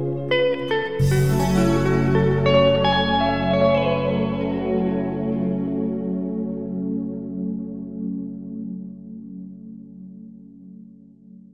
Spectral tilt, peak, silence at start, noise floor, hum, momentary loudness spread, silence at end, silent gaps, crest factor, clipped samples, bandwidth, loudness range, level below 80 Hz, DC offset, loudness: -7 dB/octave; -4 dBFS; 0 s; -46 dBFS; none; 19 LU; 0.15 s; none; 18 dB; under 0.1%; 14.5 kHz; 15 LU; -40 dBFS; under 0.1%; -21 LUFS